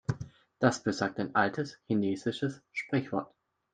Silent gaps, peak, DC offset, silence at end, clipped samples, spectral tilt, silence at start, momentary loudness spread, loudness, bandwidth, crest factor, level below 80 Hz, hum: none; -8 dBFS; under 0.1%; 0.5 s; under 0.1%; -6 dB/octave; 0.1 s; 10 LU; -32 LUFS; 9.4 kHz; 24 dB; -66 dBFS; none